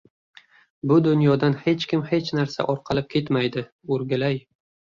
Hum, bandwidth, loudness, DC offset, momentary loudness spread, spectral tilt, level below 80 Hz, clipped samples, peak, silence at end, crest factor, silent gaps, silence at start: none; 7.4 kHz; -23 LUFS; under 0.1%; 9 LU; -7.5 dB/octave; -58 dBFS; under 0.1%; -6 dBFS; 0.55 s; 16 dB; 3.72-3.79 s; 0.85 s